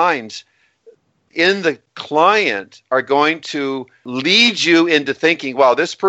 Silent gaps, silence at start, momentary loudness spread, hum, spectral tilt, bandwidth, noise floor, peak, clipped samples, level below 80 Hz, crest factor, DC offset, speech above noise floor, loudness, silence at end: none; 0 s; 15 LU; none; -3.5 dB/octave; 8.4 kHz; -50 dBFS; 0 dBFS; under 0.1%; -66 dBFS; 16 dB; under 0.1%; 34 dB; -15 LUFS; 0 s